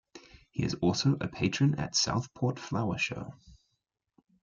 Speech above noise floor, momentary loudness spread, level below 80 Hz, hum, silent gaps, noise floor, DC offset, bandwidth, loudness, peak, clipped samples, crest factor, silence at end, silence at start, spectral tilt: 52 dB; 8 LU; -58 dBFS; none; none; -82 dBFS; under 0.1%; 7.6 kHz; -30 LUFS; -16 dBFS; under 0.1%; 16 dB; 0.9 s; 0.15 s; -4.5 dB/octave